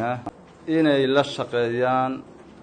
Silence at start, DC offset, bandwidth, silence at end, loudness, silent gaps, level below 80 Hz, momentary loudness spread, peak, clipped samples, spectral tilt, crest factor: 0 s; under 0.1%; 9.4 kHz; 0 s; -22 LUFS; none; -62 dBFS; 16 LU; -6 dBFS; under 0.1%; -6 dB/octave; 16 dB